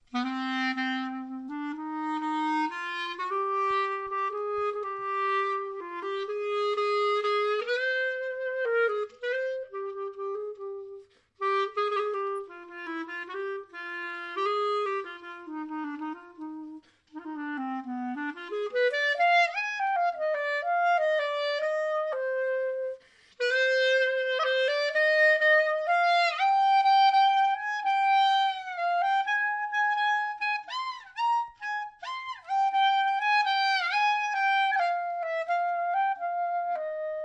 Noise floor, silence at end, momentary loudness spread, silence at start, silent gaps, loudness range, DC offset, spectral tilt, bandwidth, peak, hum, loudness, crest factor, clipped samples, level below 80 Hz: -49 dBFS; 0 s; 14 LU; 0.15 s; none; 10 LU; under 0.1%; -1.5 dB/octave; 9.2 kHz; -14 dBFS; none; -27 LUFS; 14 dB; under 0.1%; -78 dBFS